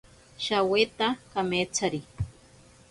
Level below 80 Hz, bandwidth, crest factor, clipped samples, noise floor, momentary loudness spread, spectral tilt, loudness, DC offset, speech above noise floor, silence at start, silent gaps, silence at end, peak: -52 dBFS; 11.5 kHz; 20 dB; under 0.1%; -55 dBFS; 13 LU; -3.5 dB/octave; -28 LUFS; under 0.1%; 28 dB; 0.4 s; none; 0.6 s; -10 dBFS